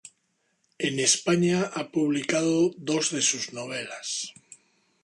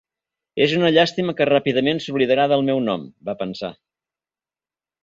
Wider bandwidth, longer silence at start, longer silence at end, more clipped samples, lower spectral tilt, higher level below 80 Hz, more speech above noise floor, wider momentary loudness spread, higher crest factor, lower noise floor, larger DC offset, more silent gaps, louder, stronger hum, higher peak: first, 11.5 kHz vs 7.8 kHz; second, 0.05 s vs 0.55 s; second, 0.5 s vs 1.3 s; neither; second, -3.5 dB/octave vs -6 dB/octave; second, -70 dBFS vs -62 dBFS; second, 47 dB vs over 71 dB; second, 11 LU vs 14 LU; about the same, 20 dB vs 18 dB; second, -73 dBFS vs under -90 dBFS; neither; neither; second, -25 LUFS vs -19 LUFS; neither; second, -6 dBFS vs -2 dBFS